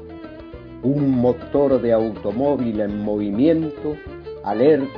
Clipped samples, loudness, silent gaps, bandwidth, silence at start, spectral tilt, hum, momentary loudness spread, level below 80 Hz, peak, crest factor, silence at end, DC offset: under 0.1%; -20 LUFS; none; 5.4 kHz; 0 s; -10.5 dB/octave; none; 18 LU; -46 dBFS; -4 dBFS; 16 dB; 0 s; under 0.1%